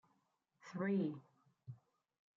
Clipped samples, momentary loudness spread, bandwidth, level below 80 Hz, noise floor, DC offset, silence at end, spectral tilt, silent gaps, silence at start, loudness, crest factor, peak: under 0.1%; 23 LU; 7.4 kHz; under -90 dBFS; -82 dBFS; under 0.1%; 0.6 s; -8 dB/octave; none; 0.65 s; -41 LUFS; 16 dB; -30 dBFS